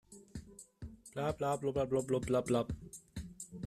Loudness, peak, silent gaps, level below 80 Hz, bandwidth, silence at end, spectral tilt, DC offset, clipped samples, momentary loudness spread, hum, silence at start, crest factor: -36 LUFS; -18 dBFS; none; -56 dBFS; 15 kHz; 0 s; -6 dB/octave; under 0.1%; under 0.1%; 18 LU; none; 0.1 s; 18 dB